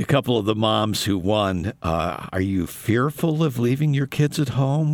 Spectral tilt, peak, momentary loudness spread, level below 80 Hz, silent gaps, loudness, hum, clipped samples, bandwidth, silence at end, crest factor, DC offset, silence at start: -6 dB/octave; -6 dBFS; 5 LU; -50 dBFS; none; -22 LUFS; none; under 0.1%; 19 kHz; 0 s; 16 dB; under 0.1%; 0 s